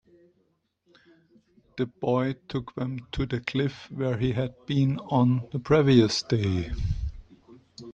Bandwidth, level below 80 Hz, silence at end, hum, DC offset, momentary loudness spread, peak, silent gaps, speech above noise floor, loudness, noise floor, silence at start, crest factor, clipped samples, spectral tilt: 8.4 kHz; -42 dBFS; 0 s; none; under 0.1%; 13 LU; -8 dBFS; none; 46 dB; -26 LUFS; -71 dBFS; 1.75 s; 20 dB; under 0.1%; -7 dB/octave